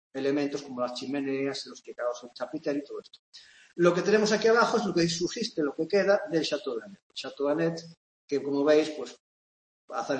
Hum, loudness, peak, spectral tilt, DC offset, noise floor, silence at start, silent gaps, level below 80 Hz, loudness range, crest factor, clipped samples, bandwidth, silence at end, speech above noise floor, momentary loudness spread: none; -28 LUFS; -8 dBFS; -4.5 dB/octave; under 0.1%; under -90 dBFS; 0.15 s; 3.19-3.32 s, 7.02-7.10 s, 7.97-8.28 s, 9.20-9.88 s; -70 dBFS; 7 LU; 20 dB; under 0.1%; 8.8 kHz; 0 s; over 62 dB; 16 LU